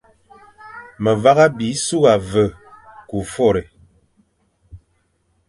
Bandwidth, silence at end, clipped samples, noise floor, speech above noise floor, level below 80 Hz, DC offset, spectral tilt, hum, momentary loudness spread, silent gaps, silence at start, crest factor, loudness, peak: 11.5 kHz; 0.7 s; under 0.1%; -64 dBFS; 49 dB; -46 dBFS; under 0.1%; -5 dB/octave; none; 17 LU; none; 0.65 s; 20 dB; -17 LUFS; 0 dBFS